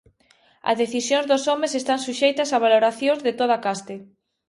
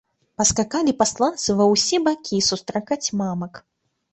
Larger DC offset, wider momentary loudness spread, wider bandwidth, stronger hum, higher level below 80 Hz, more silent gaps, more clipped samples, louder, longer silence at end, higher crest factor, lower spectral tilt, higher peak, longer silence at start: neither; about the same, 10 LU vs 10 LU; first, 11.5 kHz vs 8.4 kHz; neither; second, -70 dBFS vs -50 dBFS; neither; neither; about the same, -21 LUFS vs -20 LUFS; about the same, 0.45 s vs 0.55 s; about the same, 18 dB vs 18 dB; about the same, -2.5 dB/octave vs -3.5 dB/octave; about the same, -6 dBFS vs -4 dBFS; first, 0.65 s vs 0.4 s